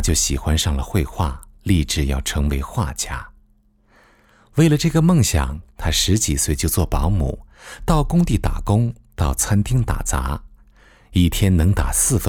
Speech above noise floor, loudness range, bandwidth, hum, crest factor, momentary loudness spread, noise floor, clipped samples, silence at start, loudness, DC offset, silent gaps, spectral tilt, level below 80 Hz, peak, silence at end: 38 dB; 4 LU; 19 kHz; none; 16 dB; 10 LU; -57 dBFS; under 0.1%; 0 s; -19 LUFS; under 0.1%; none; -4.5 dB/octave; -26 dBFS; -4 dBFS; 0 s